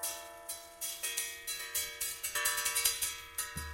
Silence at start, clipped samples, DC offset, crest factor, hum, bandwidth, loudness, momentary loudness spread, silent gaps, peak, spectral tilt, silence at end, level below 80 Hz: 0 s; under 0.1%; under 0.1%; 28 dB; none; 17 kHz; -34 LUFS; 12 LU; none; -10 dBFS; 1 dB/octave; 0 s; -60 dBFS